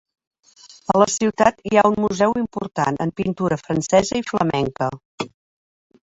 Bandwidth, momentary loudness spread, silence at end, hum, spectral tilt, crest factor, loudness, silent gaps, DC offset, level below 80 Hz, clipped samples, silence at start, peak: 8 kHz; 11 LU; 0.75 s; none; -5 dB/octave; 20 dB; -20 LUFS; 5.05-5.18 s; under 0.1%; -52 dBFS; under 0.1%; 0.9 s; 0 dBFS